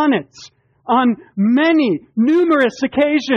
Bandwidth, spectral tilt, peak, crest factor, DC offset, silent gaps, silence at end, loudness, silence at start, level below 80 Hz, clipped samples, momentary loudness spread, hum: 7.4 kHz; -6 dB/octave; -4 dBFS; 12 dB; under 0.1%; none; 0 s; -16 LUFS; 0 s; -60 dBFS; under 0.1%; 6 LU; none